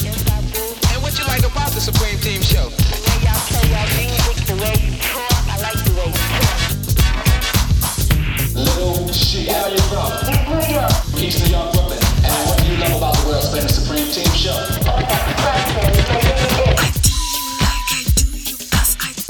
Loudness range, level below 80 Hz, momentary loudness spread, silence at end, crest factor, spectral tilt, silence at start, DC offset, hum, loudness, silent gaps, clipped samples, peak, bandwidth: 1 LU; -20 dBFS; 3 LU; 0 s; 14 dB; -4 dB/octave; 0 s; under 0.1%; none; -17 LUFS; none; under 0.1%; -2 dBFS; 19.5 kHz